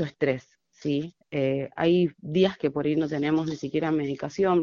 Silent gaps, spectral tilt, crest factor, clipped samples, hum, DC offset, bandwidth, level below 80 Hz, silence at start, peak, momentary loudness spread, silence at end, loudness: none; -7.5 dB/octave; 16 dB; under 0.1%; none; under 0.1%; 7.2 kHz; -62 dBFS; 0 s; -10 dBFS; 7 LU; 0 s; -27 LUFS